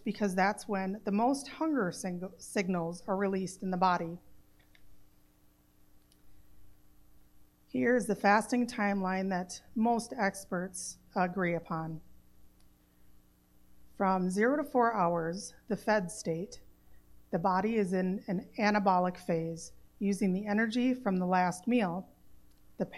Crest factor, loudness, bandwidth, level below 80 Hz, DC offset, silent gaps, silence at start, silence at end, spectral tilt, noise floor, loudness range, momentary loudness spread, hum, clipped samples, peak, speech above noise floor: 20 dB; -32 LUFS; 13.5 kHz; -64 dBFS; under 0.1%; none; 0 s; 0 s; -6 dB/octave; -65 dBFS; 6 LU; 11 LU; 60 Hz at -60 dBFS; under 0.1%; -12 dBFS; 33 dB